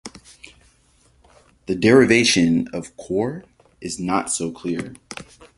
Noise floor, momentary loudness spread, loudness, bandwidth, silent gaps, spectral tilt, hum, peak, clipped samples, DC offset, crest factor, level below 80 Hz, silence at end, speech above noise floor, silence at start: -58 dBFS; 23 LU; -19 LUFS; 11.5 kHz; none; -4 dB/octave; none; -2 dBFS; under 0.1%; under 0.1%; 20 dB; -52 dBFS; 0.35 s; 39 dB; 0.05 s